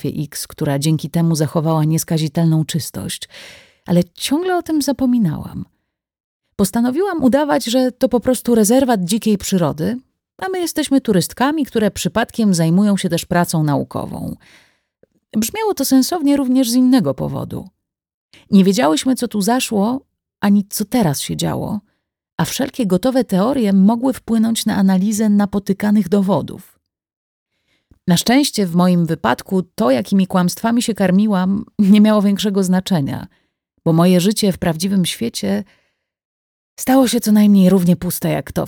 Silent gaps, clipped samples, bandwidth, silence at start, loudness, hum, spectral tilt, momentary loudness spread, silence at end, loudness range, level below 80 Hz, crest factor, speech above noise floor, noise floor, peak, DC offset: 6.20-6.40 s, 18.14-18.29 s, 22.32-22.36 s, 27.16-27.46 s, 36.25-36.77 s; under 0.1%; 19 kHz; 0.05 s; -16 LUFS; none; -5.5 dB/octave; 11 LU; 0 s; 4 LU; -48 dBFS; 14 dB; 53 dB; -69 dBFS; -2 dBFS; under 0.1%